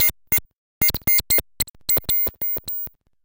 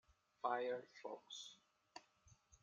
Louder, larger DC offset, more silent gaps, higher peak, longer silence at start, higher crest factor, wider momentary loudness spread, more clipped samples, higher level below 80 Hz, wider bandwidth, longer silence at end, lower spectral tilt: first, -19 LUFS vs -47 LUFS; neither; first, 0.58-0.81 s, 1.70-1.74 s vs none; first, -10 dBFS vs -26 dBFS; second, 0 s vs 0.45 s; second, 14 dB vs 24 dB; second, 11 LU vs 19 LU; neither; first, -42 dBFS vs -84 dBFS; first, 18 kHz vs 9 kHz; about the same, 0.35 s vs 0.3 s; about the same, -1.5 dB/octave vs -2.5 dB/octave